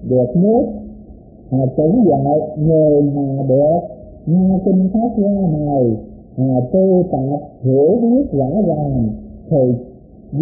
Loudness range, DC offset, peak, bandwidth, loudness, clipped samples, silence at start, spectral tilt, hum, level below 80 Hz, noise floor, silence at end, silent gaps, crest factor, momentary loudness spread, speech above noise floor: 2 LU; under 0.1%; -4 dBFS; 0.9 kHz; -15 LUFS; under 0.1%; 0 s; -20 dB/octave; none; -40 dBFS; -38 dBFS; 0 s; none; 12 dB; 10 LU; 24 dB